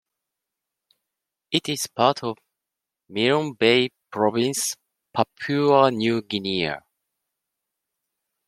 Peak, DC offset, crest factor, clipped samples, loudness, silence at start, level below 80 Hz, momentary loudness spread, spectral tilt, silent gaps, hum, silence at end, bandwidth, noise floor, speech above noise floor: -2 dBFS; under 0.1%; 22 dB; under 0.1%; -22 LUFS; 1.5 s; -66 dBFS; 13 LU; -4 dB/octave; none; none; 1.7 s; 15 kHz; -86 dBFS; 64 dB